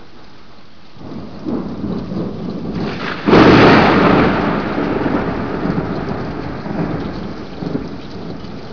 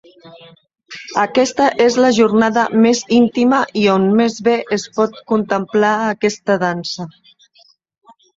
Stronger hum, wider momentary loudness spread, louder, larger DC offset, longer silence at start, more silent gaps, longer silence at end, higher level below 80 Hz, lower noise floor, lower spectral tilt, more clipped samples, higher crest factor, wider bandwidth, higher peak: neither; first, 20 LU vs 9 LU; about the same, -15 LUFS vs -15 LUFS; first, 2% vs under 0.1%; second, 0 s vs 0.25 s; neither; second, 0 s vs 1.25 s; first, -36 dBFS vs -58 dBFS; second, -43 dBFS vs -53 dBFS; first, -7.5 dB/octave vs -5 dB/octave; neither; about the same, 16 dB vs 14 dB; second, 5.4 kHz vs 7.8 kHz; about the same, 0 dBFS vs -2 dBFS